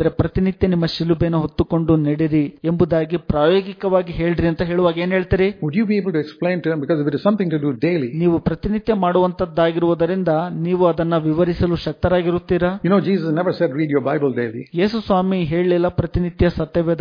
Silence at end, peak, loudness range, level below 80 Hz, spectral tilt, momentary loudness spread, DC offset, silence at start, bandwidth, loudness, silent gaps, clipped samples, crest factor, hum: 0 s; -2 dBFS; 1 LU; -38 dBFS; -9.5 dB/octave; 4 LU; under 0.1%; 0 s; 5.2 kHz; -19 LUFS; none; under 0.1%; 16 dB; none